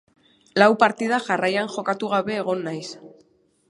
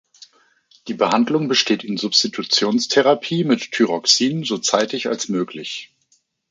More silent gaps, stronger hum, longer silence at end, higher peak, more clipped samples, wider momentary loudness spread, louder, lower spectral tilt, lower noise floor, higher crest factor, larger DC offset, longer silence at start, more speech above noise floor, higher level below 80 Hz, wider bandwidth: neither; neither; about the same, 0.6 s vs 0.65 s; about the same, 0 dBFS vs 0 dBFS; neither; first, 15 LU vs 10 LU; second, -22 LUFS vs -18 LUFS; first, -5 dB/octave vs -3.5 dB/octave; about the same, -60 dBFS vs -63 dBFS; about the same, 22 dB vs 20 dB; neither; second, 0.55 s vs 0.85 s; second, 39 dB vs 44 dB; about the same, -70 dBFS vs -68 dBFS; first, 11.5 kHz vs 9.4 kHz